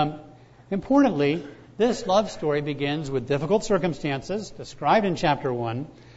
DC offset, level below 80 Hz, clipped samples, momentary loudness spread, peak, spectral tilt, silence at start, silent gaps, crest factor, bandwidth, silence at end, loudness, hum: under 0.1%; -50 dBFS; under 0.1%; 11 LU; -8 dBFS; -6 dB/octave; 0 s; none; 16 dB; 8 kHz; 0.05 s; -24 LUFS; none